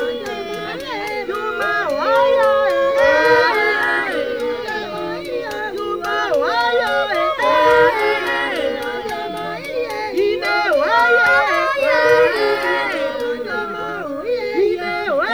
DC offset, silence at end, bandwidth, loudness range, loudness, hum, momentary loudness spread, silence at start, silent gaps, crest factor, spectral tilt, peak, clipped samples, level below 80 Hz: 0.3%; 0 s; over 20 kHz; 4 LU; -17 LUFS; none; 12 LU; 0 s; none; 16 dB; -3.5 dB/octave; -2 dBFS; under 0.1%; -52 dBFS